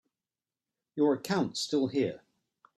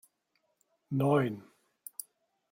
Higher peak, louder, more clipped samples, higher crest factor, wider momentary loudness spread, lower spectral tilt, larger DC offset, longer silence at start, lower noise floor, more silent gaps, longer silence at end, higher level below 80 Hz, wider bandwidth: about the same, -14 dBFS vs -14 dBFS; about the same, -30 LUFS vs -30 LUFS; neither; about the same, 18 dB vs 20 dB; second, 11 LU vs 18 LU; second, -5 dB/octave vs -7 dB/octave; neither; about the same, 0.95 s vs 0.9 s; first, under -90 dBFS vs -78 dBFS; neither; second, 0.6 s vs 1.1 s; about the same, -74 dBFS vs -74 dBFS; second, 14 kHz vs 16.5 kHz